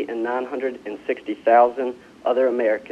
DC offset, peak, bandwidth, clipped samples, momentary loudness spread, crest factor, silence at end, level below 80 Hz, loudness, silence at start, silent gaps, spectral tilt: under 0.1%; -4 dBFS; 8 kHz; under 0.1%; 12 LU; 18 dB; 0 s; -66 dBFS; -22 LUFS; 0 s; none; -6 dB/octave